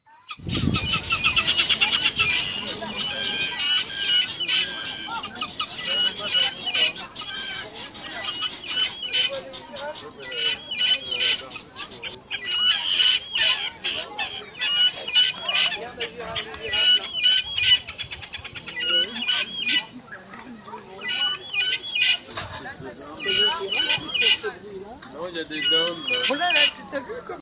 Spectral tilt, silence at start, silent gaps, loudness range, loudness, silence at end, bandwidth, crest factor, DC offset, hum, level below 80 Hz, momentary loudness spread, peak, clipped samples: 0.5 dB/octave; 0.1 s; none; 5 LU; -22 LUFS; 0 s; 4 kHz; 18 dB; under 0.1%; none; -50 dBFS; 17 LU; -8 dBFS; under 0.1%